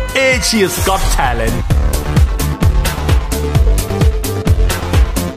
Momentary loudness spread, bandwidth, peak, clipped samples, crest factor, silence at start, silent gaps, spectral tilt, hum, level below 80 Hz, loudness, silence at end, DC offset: 4 LU; 15.5 kHz; -2 dBFS; under 0.1%; 12 dB; 0 s; none; -4.5 dB/octave; none; -16 dBFS; -14 LUFS; 0 s; under 0.1%